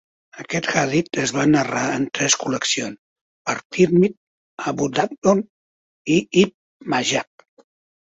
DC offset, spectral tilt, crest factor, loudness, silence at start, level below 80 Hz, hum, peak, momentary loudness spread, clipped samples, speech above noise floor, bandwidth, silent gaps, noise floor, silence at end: under 0.1%; -4 dB/octave; 20 dB; -20 LUFS; 0.35 s; -58 dBFS; none; -2 dBFS; 13 LU; under 0.1%; over 70 dB; 8.2 kHz; 2.98-3.45 s, 3.65-3.70 s, 4.17-4.57 s, 5.18-5.22 s, 5.49-6.05 s, 6.54-6.80 s; under -90 dBFS; 0.95 s